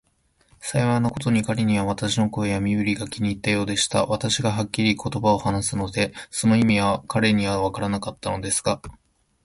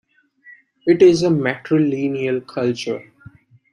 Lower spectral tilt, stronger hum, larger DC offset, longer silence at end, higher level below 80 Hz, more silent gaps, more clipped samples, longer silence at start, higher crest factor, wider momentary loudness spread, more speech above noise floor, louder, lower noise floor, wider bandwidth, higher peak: second, -5 dB/octave vs -6.5 dB/octave; neither; neither; second, 0.55 s vs 0.7 s; first, -46 dBFS vs -58 dBFS; neither; neither; about the same, 0.6 s vs 0.5 s; about the same, 18 dB vs 18 dB; second, 7 LU vs 13 LU; first, 42 dB vs 32 dB; second, -23 LUFS vs -18 LUFS; first, -64 dBFS vs -49 dBFS; about the same, 11.5 kHz vs 10.5 kHz; about the same, -4 dBFS vs -2 dBFS